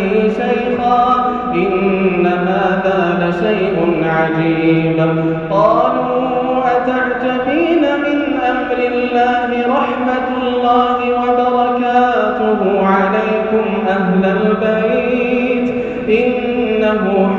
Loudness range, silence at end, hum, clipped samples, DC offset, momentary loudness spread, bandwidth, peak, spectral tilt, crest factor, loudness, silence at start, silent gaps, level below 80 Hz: 1 LU; 0 s; none; under 0.1%; under 0.1%; 3 LU; 7.2 kHz; -2 dBFS; -8 dB/octave; 12 dB; -14 LUFS; 0 s; none; -44 dBFS